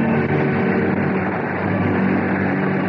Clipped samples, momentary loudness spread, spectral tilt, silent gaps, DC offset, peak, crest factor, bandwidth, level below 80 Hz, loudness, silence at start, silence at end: under 0.1%; 3 LU; -10.5 dB/octave; none; under 0.1%; -6 dBFS; 12 dB; 5.4 kHz; -56 dBFS; -19 LUFS; 0 s; 0 s